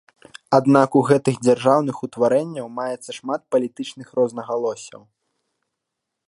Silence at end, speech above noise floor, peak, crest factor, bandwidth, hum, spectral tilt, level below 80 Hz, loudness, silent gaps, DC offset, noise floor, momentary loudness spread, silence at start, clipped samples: 1.4 s; 61 dB; 0 dBFS; 20 dB; 11.5 kHz; none; -6.5 dB/octave; -68 dBFS; -20 LUFS; none; under 0.1%; -81 dBFS; 13 LU; 0.5 s; under 0.1%